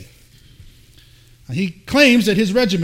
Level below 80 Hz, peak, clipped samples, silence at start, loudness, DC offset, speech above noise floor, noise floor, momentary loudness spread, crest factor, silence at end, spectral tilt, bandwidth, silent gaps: -46 dBFS; 0 dBFS; under 0.1%; 0 s; -16 LUFS; under 0.1%; 32 dB; -48 dBFS; 12 LU; 18 dB; 0 s; -5 dB/octave; 16.5 kHz; none